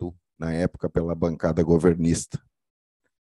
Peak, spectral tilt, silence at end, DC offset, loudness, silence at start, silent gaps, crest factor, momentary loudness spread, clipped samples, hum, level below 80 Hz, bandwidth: -6 dBFS; -7 dB/octave; 0.95 s; under 0.1%; -24 LUFS; 0 s; none; 20 dB; 15 LU; under 0.1%; none; -44 dBFS; 12 kHz